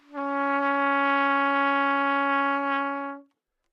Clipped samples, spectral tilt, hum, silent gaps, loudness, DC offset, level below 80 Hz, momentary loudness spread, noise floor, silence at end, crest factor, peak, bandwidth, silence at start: under 0.1%; -4 dB/octave; none; none; -24 LUFS; under 0.1%; -90 dBFS; 8 LU; -66 dBFS; 0.5 s; 14 dB; -12 dBFS; 6.2 kHz; 0.1 s